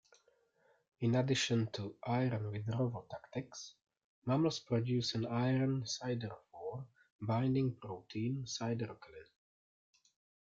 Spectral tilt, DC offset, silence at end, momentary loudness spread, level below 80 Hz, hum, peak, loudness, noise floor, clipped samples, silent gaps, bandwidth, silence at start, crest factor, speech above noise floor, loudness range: -6 dB/octave; under 0.1%; 1.2 s; 14 LU; -72 dBFS; none; -20 dBFS; -37 LUFS; -74 dBFS; under 0.1%; 4.04-4.22 s, 7.10-7.19 s; 7.8 kHz; 1 s; 18 dB; 37 dB; 3 LU